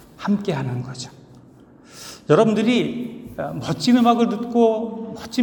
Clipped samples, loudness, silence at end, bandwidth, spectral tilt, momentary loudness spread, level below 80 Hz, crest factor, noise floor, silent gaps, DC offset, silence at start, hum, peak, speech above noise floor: under 0.1%; -20 LUFS; 0 s; 18 kHz; -6 dB/octave; 18 LU; -58 dBFS; 20 dB; -47 dBFS; none; under 0.1%; 0.2 s; none; -2 dBFS; 28 dB